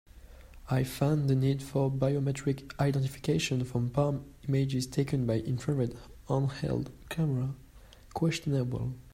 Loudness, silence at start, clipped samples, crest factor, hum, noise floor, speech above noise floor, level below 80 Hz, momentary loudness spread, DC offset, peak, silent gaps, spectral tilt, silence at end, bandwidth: -31 LUFS; 0.15 s; under 0.1%; 18 dB; none; -53 dBFS; 23 dB; -52 dBFS; 7 LU; under 0.1%; -14 dBFS; none; -7 dB/octave; 0.05 s; 15.5 kHz